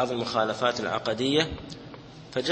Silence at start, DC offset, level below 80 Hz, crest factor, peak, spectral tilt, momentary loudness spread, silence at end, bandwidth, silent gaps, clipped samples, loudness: 0 s; under 0.1%; -52 dBFS; 22 dB; -6 dBFS; -4.5 dB/octave; 18 LU; 0 s; 8.8 kHz; none; under 0.1%; -27 LUFS